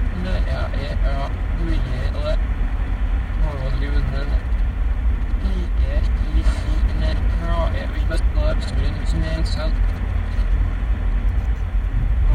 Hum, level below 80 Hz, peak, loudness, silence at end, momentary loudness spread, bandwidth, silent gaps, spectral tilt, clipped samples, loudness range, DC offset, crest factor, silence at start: none; -20 dBFS; -6 dBFS; -23 LUFS; 0 s; 3 LU; 9.4 kHz; none; -7 dB/octave; under 0.1%; 2 LU; under 0.1%; 12 dB; 0 s